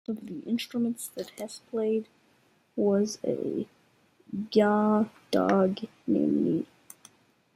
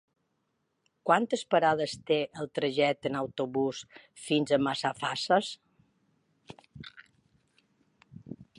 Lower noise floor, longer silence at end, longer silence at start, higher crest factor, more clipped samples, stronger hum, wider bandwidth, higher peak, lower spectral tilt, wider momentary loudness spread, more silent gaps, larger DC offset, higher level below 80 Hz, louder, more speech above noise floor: second, -66 dBFS vs -78 dBFS; first, 0.9 s vs 0.15 s; second, 0.1 s vs 1.05 s; about the same, 20 dB vs 22 dB; neither; neither; first, 15.5 kHz vs 11.5 kHz; about the same, -10 dBFS vs -10 dBFS; first, -6 dB/octave vs -4.5 dB/octave; second, 14 LU vs 21 LU; neither; neither; about the same, -72 dBFS vs -72 dBFS; about the same, -28 LUFS vs -29 LUFS; second, 38 dB vs 49 dB